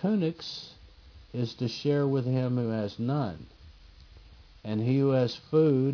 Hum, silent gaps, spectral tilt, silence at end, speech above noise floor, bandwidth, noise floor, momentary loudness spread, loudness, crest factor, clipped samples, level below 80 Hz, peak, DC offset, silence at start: none; none; -8 dB/octave; 0 s; 25 dB; 5.4 kHz; -52 dBFS; 15 LU; -28 LUFS; 16 dB; under 0.1%; -58 dBFS; -14 dBFS; under 0.1%; 0 s